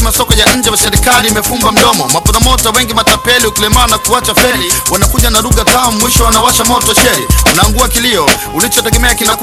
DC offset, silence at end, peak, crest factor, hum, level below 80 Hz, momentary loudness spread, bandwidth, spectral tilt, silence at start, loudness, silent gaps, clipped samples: under 0.1%; 0 s; 0 dBFS; 8 dB; none; -18 dBFS; 2 LU; over 20 kHz; -2.5 dB/octave; 0 s; -8 LUFS; none; 1%